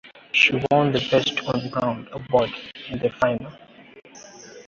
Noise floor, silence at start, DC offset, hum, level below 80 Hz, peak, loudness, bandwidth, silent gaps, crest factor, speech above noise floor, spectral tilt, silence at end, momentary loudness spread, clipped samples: -44 dBFS; 0.05 s; under 0.1%; none; -54 dBFS; -4 dBFS; -21 LUFS; 7.6 kHz; none; 20 dB; 22 dB; -5 dB/octave; 0.05 s; 17 LU; under 0.1%